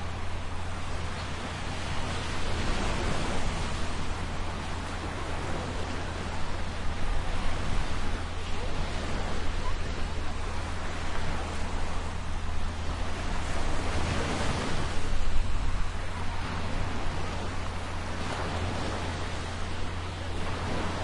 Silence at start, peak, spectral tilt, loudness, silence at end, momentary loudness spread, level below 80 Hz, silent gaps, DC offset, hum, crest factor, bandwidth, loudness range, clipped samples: 0 s; -12 dBFS; -5 dB/octave; -34 LUFS; 0 s; 5 LU; -34 dBFS; none; under 0.1%; none; 16 dB; 11 kHz; 2 LU; under 0.1%